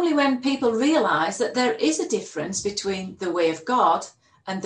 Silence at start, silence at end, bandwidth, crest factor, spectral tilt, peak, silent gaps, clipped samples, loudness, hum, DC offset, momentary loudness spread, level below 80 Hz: 0 s; 0 s; 10 kHz; 16 dB; -3.5 dB/octave; -8 dBFS; none; under 0.1%; -23 LUFS; none; under 0.1%; 9 LU; -64 dBFS